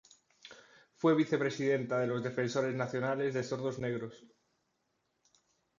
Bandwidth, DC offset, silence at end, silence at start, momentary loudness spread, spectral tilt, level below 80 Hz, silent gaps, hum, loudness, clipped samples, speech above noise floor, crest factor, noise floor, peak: 7.6 kHz; under 0.1%; 1.55 s; 0.45 s; 14 LU; -6.5 dB/octave; -74 dBFS; none; none; -33 LUFS; under 0.1%; 47 dB; 18 dB; -80 dBFS; -18 dBFS